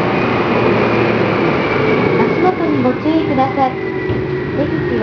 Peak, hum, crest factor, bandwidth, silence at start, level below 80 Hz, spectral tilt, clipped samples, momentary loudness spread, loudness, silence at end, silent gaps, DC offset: 0 dBFS; none; 14 dB; 5.4 kHz; 0 s; -40 dBFS; -8 dB/octave; under 0.1%; 5 LU; -15 LUFS; 0 s; none; under 0.1%